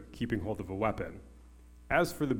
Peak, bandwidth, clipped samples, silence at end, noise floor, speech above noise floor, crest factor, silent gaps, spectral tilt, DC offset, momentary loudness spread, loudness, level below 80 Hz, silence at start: -12 dBFS; 17 kHz; under 0.1%; 0 s; -54 dBFS; 22 dB; 22 dB; none; -6 dB/octave; under 0.1%; 12 LU; -33 LUFS; -52 dBFS; 0 s